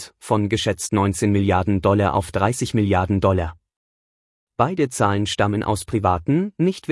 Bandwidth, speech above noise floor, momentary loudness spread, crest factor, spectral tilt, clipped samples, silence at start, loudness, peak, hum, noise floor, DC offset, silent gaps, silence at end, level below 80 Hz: 12 kHz; over 71 dB; 4 LU; 16 dB; -6 dB/octave; under 0.1%; 0 s; -20 LUFS; -4 dBFS; none; under -90 dBFS; under 0.1%; 3.76-4.47 s; 0 s; -46 dBFS